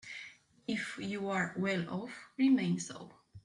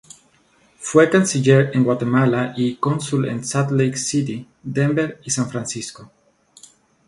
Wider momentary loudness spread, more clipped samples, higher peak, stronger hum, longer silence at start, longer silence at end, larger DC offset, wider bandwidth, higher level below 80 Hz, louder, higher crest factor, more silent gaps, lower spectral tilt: first, 17 LU vs 12 LU; neither; second, -20 dBFS vs 0 dBFS; neither; second, 0.05 s vs 0.8 s; second, 0.05 s vs 1 s; neither; about the same, 11 kHz vs 11.5 kHz; second, -76 dBFS vs -58 dBFS; second, -34 LUFS vs -19 LUFS; about the same, 16 dB vs 18 dB; neither; about the same, -5.5 dB/octave vs -5.5 dB/octave